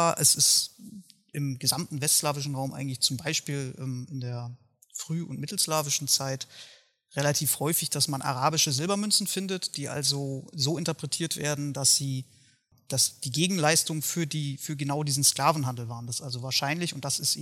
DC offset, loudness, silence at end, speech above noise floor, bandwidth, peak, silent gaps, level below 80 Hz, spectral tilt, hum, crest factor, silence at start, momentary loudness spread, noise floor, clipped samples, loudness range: under 0.1%; -26 LUFS; 0 s; 35 dB; 17 kHz; -6 dBFS; none; -72 dBFS; -3 dB/octave; none; 22 dB; 0 s; 13 LU; -63 dBFS; under 0.1%; 4 LU